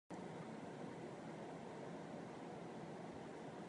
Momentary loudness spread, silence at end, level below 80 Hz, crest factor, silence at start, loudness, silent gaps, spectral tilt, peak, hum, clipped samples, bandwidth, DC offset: 1 LU; 0 s; -80 dBFS; 12 dB; 0.1 s; -52 LUFS; none; -6.5 dB/octave; -40 dBFS; none; under 0.1%; 10.5 kHz; under 0.1%